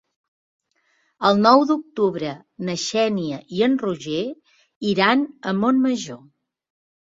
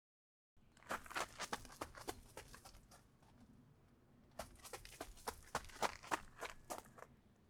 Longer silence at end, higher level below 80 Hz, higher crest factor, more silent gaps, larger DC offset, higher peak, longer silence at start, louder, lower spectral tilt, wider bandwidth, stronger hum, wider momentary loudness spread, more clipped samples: first, 1.05 s vs 0 s; about the same, -64 dBFS vs -66 dBFS; second, 20 dB vs 30 dB; first, 4.76-4.81 s vs none; neither; first, -2 dBFS vs -22 dBFS; first, 1.2 s vs 0.55 s; first, -21 LUFS vs -49 LUFS; first, -5 dB/octave vs -2.5 dB/octave; second, 7.8 kHz vs over 20 kHz; neither; second, 14 LU vs 22 LU; neither